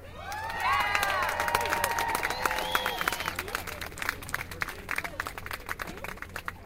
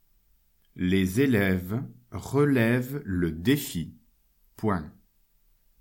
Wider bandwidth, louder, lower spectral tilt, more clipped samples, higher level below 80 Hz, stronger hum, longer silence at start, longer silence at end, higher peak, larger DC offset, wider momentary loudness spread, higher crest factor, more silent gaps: about the same, 16.5 kHz vs 17 kHz; second, -30 LUFS vs -26 LUFS; second, -2 dB/octave vs -6.5 dB/octave; neither; about the same, -48 dBFS vs -52 dBFS; neither; second, 0 s vs 0.75 s; second, 0 s vs 0.9 s; about the same, -8 dBFS vs -10 dBFS; neither; about the same, 11 LU vs 13 LU; first, 24 dB vs 18 dB; neither